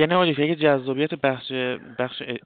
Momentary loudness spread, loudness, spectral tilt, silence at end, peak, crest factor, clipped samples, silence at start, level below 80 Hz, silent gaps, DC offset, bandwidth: 9 LU; -23 LUFS; -3.5 dB/octave; 0.1 s; -6 dBFS; 16 dB; under 0.1%; 0 s; -66 dBFS; none; under 0.1%; 4.7 kHz